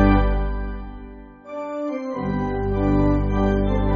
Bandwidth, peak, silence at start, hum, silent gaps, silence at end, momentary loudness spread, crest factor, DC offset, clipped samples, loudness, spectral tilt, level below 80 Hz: 6.2 kHz; -2 dBFS; 0 s; none; none; 0 s; 17 LU; 18 dB; under 0.1%; under 0.1%; -23 LUFS; -7.5 dB/octave; -26 dBFS